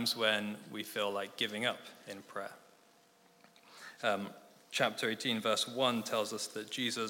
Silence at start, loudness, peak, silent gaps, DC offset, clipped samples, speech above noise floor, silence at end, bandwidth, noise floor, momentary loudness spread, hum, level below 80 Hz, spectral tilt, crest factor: 0 s; -35 LUFS; -14 dBFS; none; under 0.1%; under 0.1%; 30 dB; 0 s; 17 kHz; -66 dBFS; 15 LU; none; under -90 dBFS; -2.5 dB/octave; 24 dB